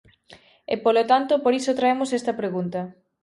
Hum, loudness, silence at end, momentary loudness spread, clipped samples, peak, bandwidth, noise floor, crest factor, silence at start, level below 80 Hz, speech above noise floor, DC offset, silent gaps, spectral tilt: none; -22 LUFS; 0.35 s; 12 LU; under 0.1%; -4 dBFS; 11.5 kHz; -52 dBFS; 18 dB; 0.3 s; -68 dBFS; 30 dB; under 0.1%; none; -5 dB/octave